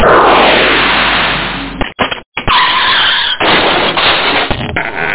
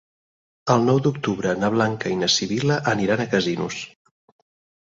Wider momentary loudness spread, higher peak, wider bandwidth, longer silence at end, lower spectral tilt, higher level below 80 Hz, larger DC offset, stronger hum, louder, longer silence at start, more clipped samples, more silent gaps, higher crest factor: about the same, 10 LU vs 9 LU; about the same, 0 dBFS vs -2 dBFS; second, 4 kHz vs 8 kHz; second, 0 s vs 0.95 s; first, -7.5 dB/octave vs -5 dB/octave; first, -30 dBFS vs -56 dBFS; neither; neither; first, -9 LUFS vs -21 LUFS; second, 0 s vs 0.65 s; neither; first, 2.26-2.32 s vs none; second, 10 dB vs 20 dB